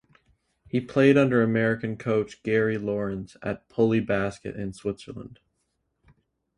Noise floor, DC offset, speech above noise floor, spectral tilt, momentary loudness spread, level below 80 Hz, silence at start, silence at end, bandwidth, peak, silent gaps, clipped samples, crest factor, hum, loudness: -76 dBFS; under 0.1%; 51 dB; -7.5 dB/octave; 15 LU; -56 dBFS; 0.75 s; 1.3 s; 11 kHz; -6 dBFS; none; under 0.1%; 20 dB; none; -25 LUFS